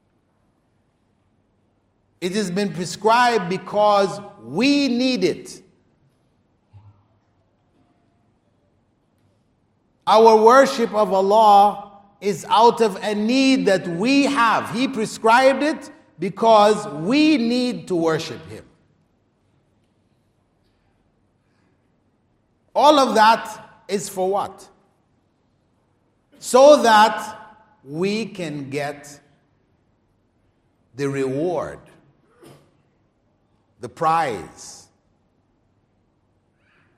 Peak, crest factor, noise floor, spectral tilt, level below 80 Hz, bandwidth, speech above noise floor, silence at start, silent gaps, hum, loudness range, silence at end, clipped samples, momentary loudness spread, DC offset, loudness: 0 dBFS; 20 dB; -65 dBFS; -4.5 dB/octave; -66 dBFS; 16 kHz; 47 dB; 2.2 s; none; none; 14 LU; 2.2 s; under 0.1%; 19 LU; under 0.1%; -18 LUFS